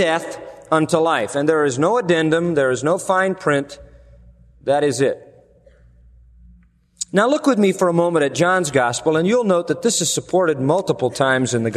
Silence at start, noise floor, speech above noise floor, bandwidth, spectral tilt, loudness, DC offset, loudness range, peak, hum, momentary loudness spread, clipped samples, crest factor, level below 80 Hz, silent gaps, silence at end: 0 s; -52 dBFS; 34 dB; 13.5 kHz; -4.5 dB/octave; -18 LUFS; under 0.1%; 6 LU; -2 dBFS; none; 5 LU; under 0.1%; 18 dB; -54 dBFS; none; 0 s